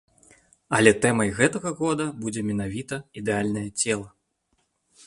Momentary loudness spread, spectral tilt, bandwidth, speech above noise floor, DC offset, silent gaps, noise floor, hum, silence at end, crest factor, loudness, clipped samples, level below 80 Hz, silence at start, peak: 12 LU; -4.5 dB/octave; 11.5 kHz; 48 dB; under 0.1%; none; -72 dBFS; none; 1 s; 24 dB; -24 LUFS; under 0.1%; -54 dBFS; 0.7 s; -2 dBFS